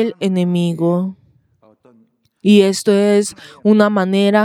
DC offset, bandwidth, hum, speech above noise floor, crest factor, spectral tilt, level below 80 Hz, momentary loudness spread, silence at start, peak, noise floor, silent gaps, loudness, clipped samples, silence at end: under 0.1%; 13.5 kHz; none; 41 dB; 14 dB; -6 dB/octave; -66 dBFS; 9 LU; 0 s; 0 dBFS; -55 dBFS; none; -15 LUFS; under 0.1%; 0 s